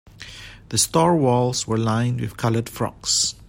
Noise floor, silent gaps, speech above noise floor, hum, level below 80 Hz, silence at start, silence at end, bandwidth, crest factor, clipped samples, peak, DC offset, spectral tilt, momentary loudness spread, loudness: -40 dBFS; none; 19 dB; none; -48 dBFS; 0.2 s; 0.15 s; 16.5 kHz; 18 dB; under 0.1%; -4 dBFS; under 0.1%; -4 dB/octave; 20 LU; -21 LUFS